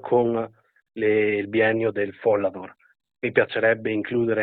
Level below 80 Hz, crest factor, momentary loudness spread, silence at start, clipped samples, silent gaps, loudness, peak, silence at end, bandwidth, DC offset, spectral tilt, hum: -64 dBFS; 20 dB; 12 LU; 0.05 s; under 0.1%; none; -23 LUFS; -4 dBFS; 0 s; 4.5 kHz; under 0.1%; -10 dB/octave; none